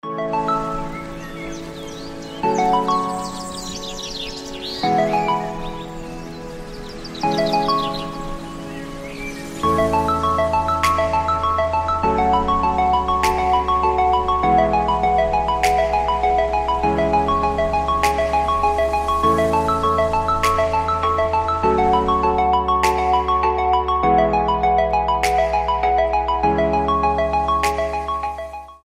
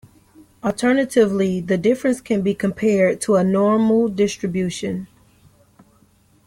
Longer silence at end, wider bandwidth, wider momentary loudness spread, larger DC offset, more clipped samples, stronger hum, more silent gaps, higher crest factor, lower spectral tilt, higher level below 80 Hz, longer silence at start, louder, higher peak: second, 0.1 s vs 1.4 s; about the same, 16 kHz vs 15 kHz; first, 14 LU vs 8 LU; neither; neither; neither; neither; about the same, 18 dB vs 16 dB; about the same, -5 dB/octave vs -6 dB/octave; first, -34 dBFS vs -56 dBFS; second, 0.05 s vs 0.65 s; about the same, -19 LUFS vs -19 LUFS; first, 0 dBFS vs -4 dBFS